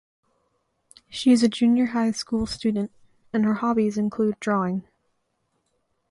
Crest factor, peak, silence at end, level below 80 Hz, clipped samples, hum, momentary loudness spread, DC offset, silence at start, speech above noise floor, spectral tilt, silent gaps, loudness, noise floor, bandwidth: 18 dB; -6 dBFS; 1.3 s; -56 dBFS; under 0.1%; none; 11 LU; under 0.1%; 1.1 s; 51 dB; -5.5 dB/octave; none; -23 LUFS; -73 dBFS; 11.5 kHz